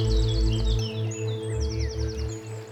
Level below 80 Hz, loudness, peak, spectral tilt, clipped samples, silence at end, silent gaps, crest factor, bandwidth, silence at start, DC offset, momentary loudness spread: -28 dBFS; -28 LUFS; -12 dBFS; -6 dB/octave; under 0.1%; 0 s; none; 12 dB; 8.8 kHz; 0 s; under 0.1%; 8 LU